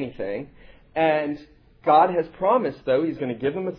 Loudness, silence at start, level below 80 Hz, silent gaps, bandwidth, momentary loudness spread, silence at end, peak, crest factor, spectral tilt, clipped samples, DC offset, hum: -23 LUFS; 0 s; -56 dBFS; none; 5.4 kHz; 14 LU; 0 s; -6 dBFS; 18 dB; -9 dB/octave; under 0.1%; under 0.1%; none